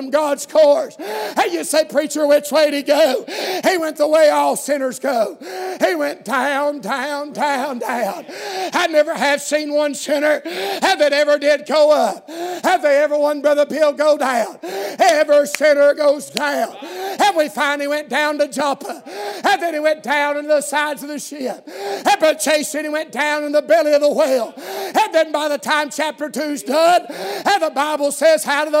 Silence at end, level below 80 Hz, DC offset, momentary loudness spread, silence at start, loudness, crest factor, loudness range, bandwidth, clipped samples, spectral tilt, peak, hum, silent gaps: 0 s; -76 dBFS; under 0.1%; 11 LU; 0 s; -17 LUFS; 18 dB; 4 LU; 16 kHz; under 0.1%; -2 dB/octave; 0 dBFS; none; none